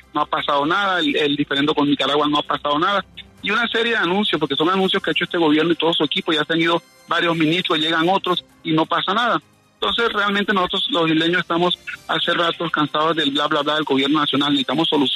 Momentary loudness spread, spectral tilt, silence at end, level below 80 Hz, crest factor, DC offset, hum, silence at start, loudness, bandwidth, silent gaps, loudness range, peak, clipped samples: 4 LU; -5 dB/octave; 0 s; -58 dBFS; 14 dB; under 0.1%; none; 0.15 s; -19 LUFS; 13 kHz; none; 1 LU; -6 dBFS; under 0.1%